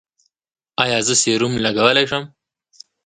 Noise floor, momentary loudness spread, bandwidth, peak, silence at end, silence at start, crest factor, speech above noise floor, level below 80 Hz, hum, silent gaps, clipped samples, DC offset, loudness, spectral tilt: -48 dBFS; 8 LU; 9.6 kHz; 0 dBFS; 0.8 s; 0.8 s; 20 dB; 31 dB; -56 dBFS; none; none; under 0.1%; under 0.1%; -16 LUFS; -2.5 dB/octave